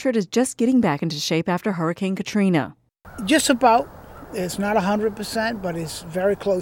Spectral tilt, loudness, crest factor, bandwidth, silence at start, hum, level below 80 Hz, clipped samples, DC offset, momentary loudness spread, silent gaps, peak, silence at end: -5 dB/octave; -21 LUFS; 18 dB; 17.5 kHz; 0 s; none; -52 dBFS; under 0.1%; under 0.1%; 12 LU; none; -2 dBFS; 0 s